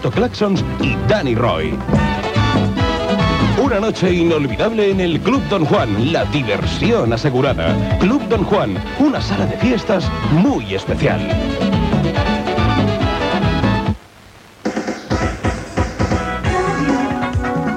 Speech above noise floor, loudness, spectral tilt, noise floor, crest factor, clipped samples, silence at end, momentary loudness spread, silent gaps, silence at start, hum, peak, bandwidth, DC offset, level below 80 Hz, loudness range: 26 dB; -17 LUFS; -6.5 dB/octave; -42 dBFS; 14 dB; under 0.1%; 0 s; 5 LU; none; 0 s; none; -2 dBFS; 11.5 kHz; under 0.1%; -30 dBFS; 4 LU